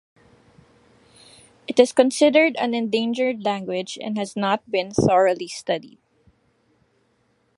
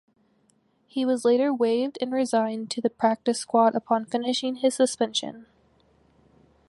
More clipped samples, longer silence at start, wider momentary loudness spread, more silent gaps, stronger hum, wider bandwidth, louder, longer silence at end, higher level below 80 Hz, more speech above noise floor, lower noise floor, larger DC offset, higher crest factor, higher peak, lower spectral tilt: neither; first, 1.7 s vs 0.95 s; first, 12 LU vs 7 LU; neither; neither; about the same, 11.5 kHz vs 11.5 kHz; first, -21 LUFS vs -25 LUFS; first, 1.7 s vs 1.25 s; first, -56 dBFS vs -74 dBFS; about the same, 45 dB vs 42 dB; about the same, -65 dBFS vs -66 dBFS; neither; about the same, 22 dB vs 18 dB; first, -2 dBFS vs -8 dBFS; about the same, -4.5 dB/octave vs -3.5 dB/octave